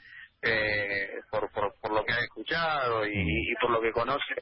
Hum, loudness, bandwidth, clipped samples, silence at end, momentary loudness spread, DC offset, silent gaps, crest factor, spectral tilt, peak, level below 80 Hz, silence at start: none; -29 LUFS; 5.8 kHz; under 0.1%; 0 s; 6 LU; under 0.1%; none; 16 dB; -9 dB/octave; -14 dBFS; -48 dBFS; 0.05 s